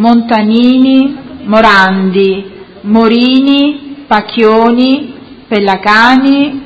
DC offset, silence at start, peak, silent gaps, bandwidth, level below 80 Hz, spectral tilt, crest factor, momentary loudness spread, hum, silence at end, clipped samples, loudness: under 0.1%; 0 s; 0 dBFS; none; 8 kHz; -44 dBFS; -6.5 dB/octave; 8 dB; 10 LU; none; 0 s; 1%; -8 LUFS